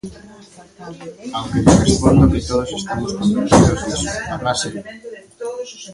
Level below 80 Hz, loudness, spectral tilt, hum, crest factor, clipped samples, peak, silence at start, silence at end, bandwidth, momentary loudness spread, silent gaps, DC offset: -30 dBFS; -16 LUFS; -5.5 dB/octave; none; 18 dB; under 0.1%; 0 dBFS; 0.05 s; 0 s; 11.5 kHz; 22 LU; none; under 0.1%